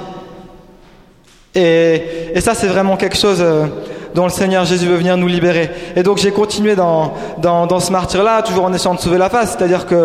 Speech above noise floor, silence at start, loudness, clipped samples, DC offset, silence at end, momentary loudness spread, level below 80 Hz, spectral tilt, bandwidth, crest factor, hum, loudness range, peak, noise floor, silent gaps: 33 dB; 0 s; -14 LUFS; under 0.1%; under 0.1%; 0 s; 6 LU; -40 dBFS; -5 dB/octave; 15.5 kHz; 12 dB; none; 1 LU; -2 dBFS; -46 dBFS; none